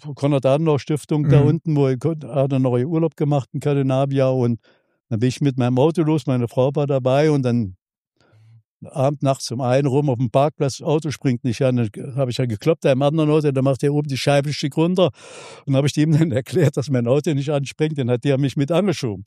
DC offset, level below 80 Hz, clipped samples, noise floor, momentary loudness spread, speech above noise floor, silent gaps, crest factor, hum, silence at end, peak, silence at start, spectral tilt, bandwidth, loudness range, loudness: under 0.1%; -58 dBFS; under 0.1%; -65 dBFS; 6 LU; 46 dB; 5.00-5.04 s, 7.82-7.86 s, 8.00-8.11 s, 8.64-8.80 s; 18 dB; none; 0.05 s; -2 dBFS; 0.05 s; -7 dB/octave; 12.5 kHz; 2 LU; -19 LUFS